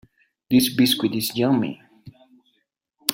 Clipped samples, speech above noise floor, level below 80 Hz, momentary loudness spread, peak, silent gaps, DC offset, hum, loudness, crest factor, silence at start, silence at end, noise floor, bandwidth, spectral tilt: under 0.1%; 52 dB; -60 dBFS; 10 LU; 0 dBFS; none; under 0.1%; none; -21 LUFS; 24 dB; 0.5 s; 0 s; -72 dBFS; 16.5 kHz; -4 dB/octave